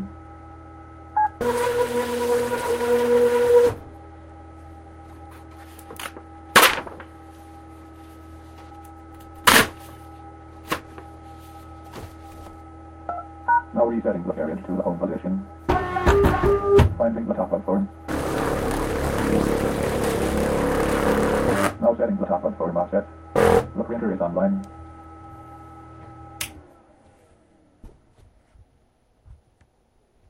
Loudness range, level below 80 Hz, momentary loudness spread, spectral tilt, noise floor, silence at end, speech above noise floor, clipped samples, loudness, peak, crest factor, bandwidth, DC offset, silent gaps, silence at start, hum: 15 LU; -38 dBFS; 25 LU; -4.5 dB/octave; -63 dBFS; 0.95 s; 40 dB; under 0.1%; -22 LUFS; 0 dBFS; 24 dB; 16 kHz; under 0.1%; none; 0 s; none